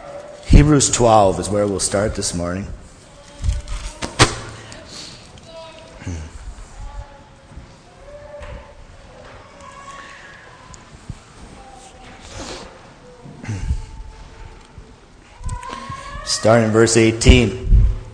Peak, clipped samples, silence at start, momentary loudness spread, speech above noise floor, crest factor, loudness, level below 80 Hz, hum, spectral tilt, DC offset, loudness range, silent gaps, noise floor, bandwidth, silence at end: 0 dBFS; under 0.1%; 0 s; 27 LU; 31 dB; 20 dB; -17 LUFS; -26 dBFS; none; -4.5 dB/octave; under 0.1%; 22 LU; none; -44 dBFS; 10.5 kHz; 0.05 s